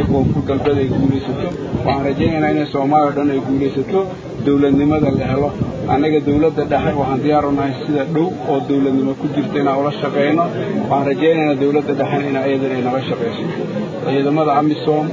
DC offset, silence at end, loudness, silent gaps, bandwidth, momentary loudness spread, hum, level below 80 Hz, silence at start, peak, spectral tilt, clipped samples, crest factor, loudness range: under 0.1%; 0 s; -17 LUFS; none; 7.6 kHz; 6 LU; none; -38 dBFS; 0 s; 0 dBFS; -8.5 dB/octave; under 0.1%; 16 dB; 1 LU